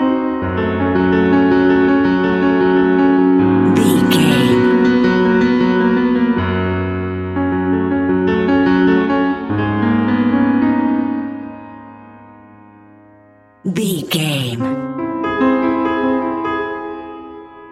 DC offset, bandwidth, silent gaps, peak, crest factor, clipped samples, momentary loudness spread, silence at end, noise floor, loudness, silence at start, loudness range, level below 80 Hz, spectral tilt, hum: under 0.1%; 14.5 kHz; none; 0 dBFS; 14 dB; under 0.1%; 10 LU; 0 s; -47 dBFS; -15 LUFS; 0 s; 10 LU; -44 dBFS; -6.5 dB/octave; none